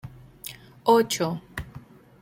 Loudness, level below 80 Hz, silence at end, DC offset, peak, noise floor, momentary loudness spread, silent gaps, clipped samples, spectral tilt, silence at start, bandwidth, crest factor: -24 LUFS; -54 dBFS; 0.45 s; under 0.1%; -6 dBFS; -47 dBFS; 21 LU; none; under 0.1%; -4.5 dB/octave; 0.05 s; 16.5 kHz; 20 dB